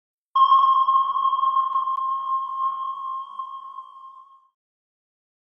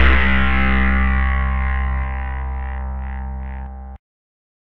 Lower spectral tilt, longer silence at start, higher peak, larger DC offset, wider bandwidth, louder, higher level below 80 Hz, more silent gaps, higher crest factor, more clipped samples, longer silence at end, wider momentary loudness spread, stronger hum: second, -1.5 dB/octave vs -8.5 dB/octave; first, 0.35 s vs 0 s; second, -8 dBFS vs 0 dBFS; neither; first, 5.6 kHz vs 4.3 kHz; about the same, -21 LUFS vs -20 LUFS; second, -84 dBFS vs -20 dBFS; neither; about the same, 16 dB vs 18 dB; neither; first, 1.3 s vs 0.8 s; first, 19 LU vs 15 LU; neither